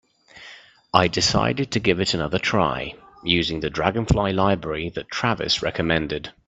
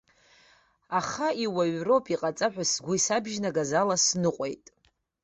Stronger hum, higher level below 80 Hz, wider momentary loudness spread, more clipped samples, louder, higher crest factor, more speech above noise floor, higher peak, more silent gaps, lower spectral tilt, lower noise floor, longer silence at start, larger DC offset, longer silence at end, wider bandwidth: neither; first, -42 dBFS vs -66 dBFS; first, 10 LU vs 7 LU; neither; first, -22 LUFS vs -27 LUFS; about the same, 22 dB vs 18 dB; second, 24 dB vs 35 dB; first, 0 dBFS vs -10 dBFS; neither; first, -4.5 dB/octave vs -3 dB/octave; second, -46 dBFS vs -62 dBFS; second, 0.35 s vs 0.9 s; neither; second, 0.2 s vs 0.7 s; about the same, 8.4 kHz vs 8.4 kHz